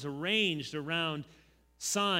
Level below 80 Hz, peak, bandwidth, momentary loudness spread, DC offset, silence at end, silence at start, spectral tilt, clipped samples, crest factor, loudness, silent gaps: -68 dBFS; -16 dBFS; 16 kHz; 12 LU; under 0.1%; 0 s; 0 s; -3 dB/octave; under 0.1%; 18 dB; -32 LUFS; none